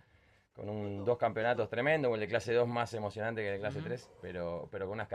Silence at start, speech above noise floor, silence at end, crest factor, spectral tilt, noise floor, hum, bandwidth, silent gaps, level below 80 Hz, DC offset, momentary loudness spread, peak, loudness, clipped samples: 0.55 s; 33 dB; 0 s; 18 dB; -6.5 dB/octave; -67 dBFS; none; 11 kHz; none; -70 dBFS; under 0.1%; 11 LU; -18 dBFS; -35 LUFS; under 0.1%